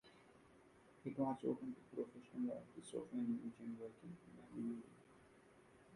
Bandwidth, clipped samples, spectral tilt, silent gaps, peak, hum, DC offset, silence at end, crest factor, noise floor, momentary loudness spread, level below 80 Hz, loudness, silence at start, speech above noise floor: 11.5 kHz; under 0.1%; -7.5 dB/octave; none; -28 dBFS; none; under 0.1%; 0 s; 20 dB; -68 dBFS; 24 LU; -82 dBFS; -48 LUFS; 0.05 s; 21 dB